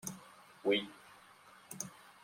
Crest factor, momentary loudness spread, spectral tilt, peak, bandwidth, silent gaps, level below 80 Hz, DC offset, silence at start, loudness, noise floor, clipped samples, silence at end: 22 dB; 25 LU; -3 dB/octave; -18 dBFS; 16.5 kHz; none; -82 dBFS; under 0.1%; 0.05 s; -38 LUFS; -60 dBFS; under 0.1%; 0.15 s